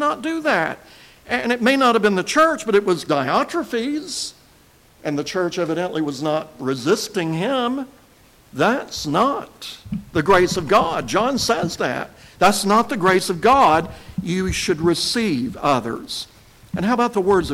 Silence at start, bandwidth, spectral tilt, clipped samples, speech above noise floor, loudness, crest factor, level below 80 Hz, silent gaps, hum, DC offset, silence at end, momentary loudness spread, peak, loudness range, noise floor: 0 s; 16.5 kHz; -4.5 dB/octave; under 0.1%; 33 dB; -19 LUFS; 16 dB; -46 dBFS; none; none; under 0.1%; 0 s; 13 LU; -4 dBFS; 5 LU; -52 dBFS